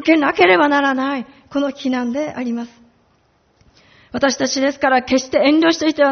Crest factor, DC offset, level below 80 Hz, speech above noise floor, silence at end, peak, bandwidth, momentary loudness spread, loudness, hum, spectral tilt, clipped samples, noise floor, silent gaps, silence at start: 18 dB; under 0.1%; -56 dBFS; 43 dB; 0 s; 0 dBFS; 6.8 kHz; 12 LU; -16 LUFS; none; -1.5 dB/octave; under 0.1%; -59 dBFS; none; 0 s